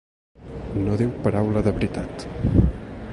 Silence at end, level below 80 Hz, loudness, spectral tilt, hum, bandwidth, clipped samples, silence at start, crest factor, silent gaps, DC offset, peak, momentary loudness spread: 0 s; -32 dBFS; -23 LUFS; -8.5 dB/octave; none; 11.5 kHz; under 0.1%; 0.4 s; 18 dB; none; under 0.1%; -4 dBFS; 13 LU